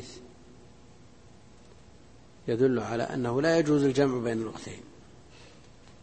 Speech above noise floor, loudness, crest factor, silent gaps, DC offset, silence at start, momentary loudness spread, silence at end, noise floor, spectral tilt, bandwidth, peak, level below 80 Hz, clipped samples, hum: 28 dB; -27 LUFS; 20 dB; none; 0.2%; 0 s; 20 LU; 0.6 s; -54 dBFS; -6.5 dB/octave; 8.8 kHz; -10 dBFS; -60 dBFS; under 0.1%; none